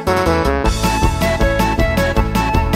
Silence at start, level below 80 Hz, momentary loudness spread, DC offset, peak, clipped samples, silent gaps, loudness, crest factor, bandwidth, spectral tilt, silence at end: 0 s; -20 dBFS; 1 LU; under 0.1%; -2 dBFS; under 0.1%; none; -16 LUFS; 14 dB; 16.5 kHz; -5.5 dB/octave; 0 s